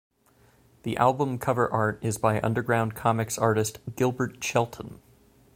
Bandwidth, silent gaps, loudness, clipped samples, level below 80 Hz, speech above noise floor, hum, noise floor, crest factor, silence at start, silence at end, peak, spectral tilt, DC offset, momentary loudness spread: 16.5 kHz; none; -26 LUFS; under 0.1%; -58 dBFS; 35 dB; none; -61 dBFS; 20 dB; 0.85 s; 0.6 s; -6 dBFS; -5.5 dB/octave; under 0.1%; 9 LU